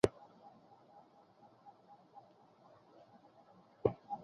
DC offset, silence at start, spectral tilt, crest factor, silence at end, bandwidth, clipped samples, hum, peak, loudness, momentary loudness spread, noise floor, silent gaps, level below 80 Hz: under 0.1%; 0.05 s; -6.5 dB/octave; 32 dB; 0.05 s; 7 kHz; under 0.1%; none; -12 dBFS; -38 LUFS; 26 LU; -65 dBFS; none; -66 dBFS